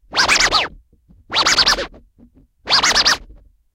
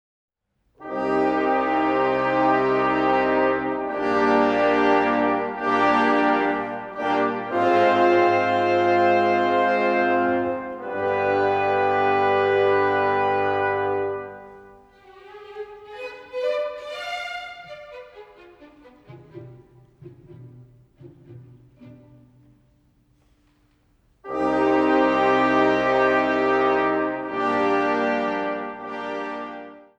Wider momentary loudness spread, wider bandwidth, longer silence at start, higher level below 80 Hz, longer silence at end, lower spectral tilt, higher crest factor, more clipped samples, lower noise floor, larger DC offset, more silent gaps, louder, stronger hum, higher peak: second, 9 LU vs 15 LU; first, 16.5 kHz vs 8.4 kHz; second, 0.1 s vs 0.8 s; first, -40 dBFS vs -58 dBFS; first, 0.5 s vs 0.2 s; second, 0 dB/octave vs -6 dB/octave; about the same, 18 dB vs 16 dB; neither; second, -51 dBFS vs -67 dBFS; neither; neither; first, -14 LUFS vs -21 LUFS; neither; first, 0 dBFS vs -6 dBFS